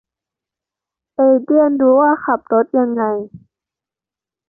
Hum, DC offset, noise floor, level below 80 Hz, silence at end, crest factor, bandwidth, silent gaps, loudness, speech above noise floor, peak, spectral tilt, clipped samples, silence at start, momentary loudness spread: none; under 0.1%; -89 dBFS; -62 dBFS; 1.1 s; 14 dB; 2.2 kHz; none; -15 LUFS; 75 dB; -2 dBFS; -12.5 dB/octave; under 0.1%; 1.2 s; 11 LU